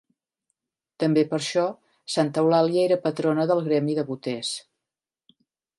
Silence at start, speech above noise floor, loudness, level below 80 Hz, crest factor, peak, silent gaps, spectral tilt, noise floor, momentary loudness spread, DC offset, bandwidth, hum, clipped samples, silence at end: 1 s; 66 dB; -24 LUFS; -76 dBFS; 18 dB; -6 dBFS; none; -5.5 dB/octave; -89 dBFS; 9 LU; under 0.1%; 11.5 kHz; none; under 0.1%; 1.2 s